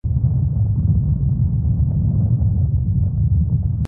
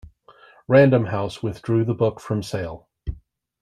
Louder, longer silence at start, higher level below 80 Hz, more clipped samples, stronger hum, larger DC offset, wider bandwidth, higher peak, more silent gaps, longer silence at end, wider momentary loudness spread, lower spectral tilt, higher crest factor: about the same, -19 LUFS vs -21 LUFS; second, 0.05 s vs 0.7 s; first, -24 dBFS vs -46 dBFS; neither; neither; neither; second, 1.3 kHz vs 12.5 kHz; second, -6 dBFS vs -2 dBFS; neither; second, 0 s vs 0.45 s; second, 1 LU vs 20 LU; first, -12.5 dB/octave vs -8 dB/octave; second, 10 dB vs 20 dB